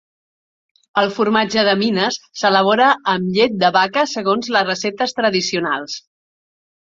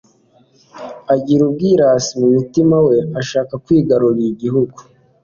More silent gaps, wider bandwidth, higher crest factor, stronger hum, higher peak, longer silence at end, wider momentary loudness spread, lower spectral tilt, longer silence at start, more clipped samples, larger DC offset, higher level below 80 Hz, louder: neither; about the same, 7.8 kHz vs 7.4 kHz; about the same, 16 dB vs 12 dB; neither; about the same, -2 dBFS vs -2 dBFS; first, 0.9 s vs 0.45 s; about the same, 7 LU vs 8 LU; second, -4 dB/octave vs -6.5 dB/octave; first, 0.95 s vs 0.75 s; neither; neither; second, -62 dBFS vs -52 dBFS; about the same, -17 LUFS vs -15 LUFS